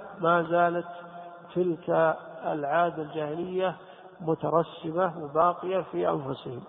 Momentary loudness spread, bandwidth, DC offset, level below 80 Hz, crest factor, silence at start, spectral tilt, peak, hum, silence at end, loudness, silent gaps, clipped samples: 11 LU; 4 kHz; under 0.1%; -68 dBFS; 18 dB; 0 s; -10.5 dB/octave; -10 dBFS; none; 0 s; -28 LUFS; none; under 0.1%